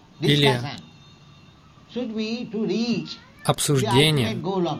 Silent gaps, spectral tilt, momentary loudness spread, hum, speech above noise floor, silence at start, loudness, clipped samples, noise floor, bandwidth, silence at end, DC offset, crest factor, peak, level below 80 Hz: none; -5 dB/octave; 15 LU; none; 28 dB; 0.2 s; -22 LUFS; under 0.1%; -50 dBFS; 16 kHz; 0 s; under 0.1%; 18 dB; -4 dBFS; -54 dBFS